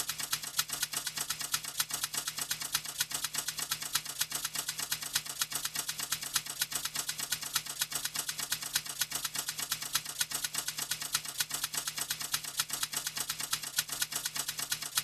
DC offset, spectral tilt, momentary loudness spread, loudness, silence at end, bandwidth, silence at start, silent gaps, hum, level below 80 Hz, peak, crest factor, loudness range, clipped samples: under 0.1%; 1 dB/octave; 2 LU; -33 LUFS; 0 s; 15.5 kHz; 0 s; none; none; -68 dBFS; -10 dBFS; 26 dB; 0 LU; under 0.1%